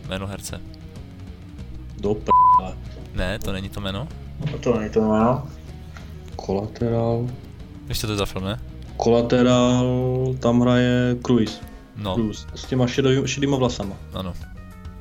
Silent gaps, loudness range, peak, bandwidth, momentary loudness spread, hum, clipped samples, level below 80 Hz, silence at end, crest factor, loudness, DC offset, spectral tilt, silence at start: none; 5 LU; -6 dBFS; 16.5 kHz; 21 LU; none; under 0.1%; -38 dBFS; 0 s; 16 dB; -22 LUFS; under 0.1%; -6 dB/octave; 0 s